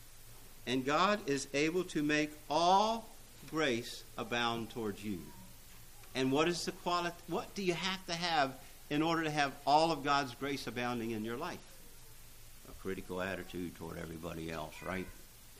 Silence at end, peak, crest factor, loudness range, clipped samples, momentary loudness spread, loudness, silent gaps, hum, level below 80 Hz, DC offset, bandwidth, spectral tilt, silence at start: 0 s; -16 dBFS; 20 dB; 10 LU; under 0.1%; 24 LU; -35 LUFS; none; none; -56 dBFS; under 0.1%; 15.5 kHz; -4 dB/octave; 0 s